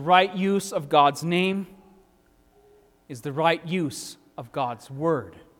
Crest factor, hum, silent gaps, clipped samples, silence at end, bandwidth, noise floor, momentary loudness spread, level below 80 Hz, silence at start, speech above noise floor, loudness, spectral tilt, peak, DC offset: 22 dB; none; none; under 0.1%; 0.2 s; 17 kHz; -60 dBFS; 17 LU; -66 dBFS; 0 s; 37 dB; -24 LUFS; -5 dB/octave; -4 dBFS; under 0.1%